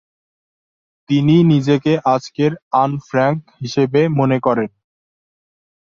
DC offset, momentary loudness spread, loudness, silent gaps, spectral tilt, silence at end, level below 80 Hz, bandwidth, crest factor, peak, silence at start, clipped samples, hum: under 0.1%; 8 LU; -16 LUFS; 2.62-2.71 s; -7.5 dB/octave; 1.2 s; -58 dBFS; 7.4 kHz; 16 dB; -2 dBFS; 1.1 s; under 0.1%; none